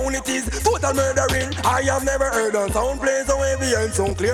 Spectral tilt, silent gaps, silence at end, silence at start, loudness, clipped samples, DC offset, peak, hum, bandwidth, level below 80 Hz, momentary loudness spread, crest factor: -4 dB/octave; none; 0 s; 0 s; -20 LUFS; under 0.1%; under 0.1%; -4 dBFS; none; 18 kHz; -32 dBFS; 3 LU; 16 dB